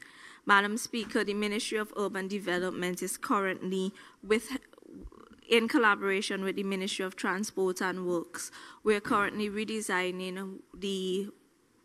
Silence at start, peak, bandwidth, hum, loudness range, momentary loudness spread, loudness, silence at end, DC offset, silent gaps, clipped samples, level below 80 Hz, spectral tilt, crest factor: 0.1 s; -10 dBFS; 15.5 kHz; none; 3 LU; 15 LU; -31 LUFS; 0.55 s; under 0.1%; none; under 0.1%; -64 dBFS; -4 dB/octave; 22 dB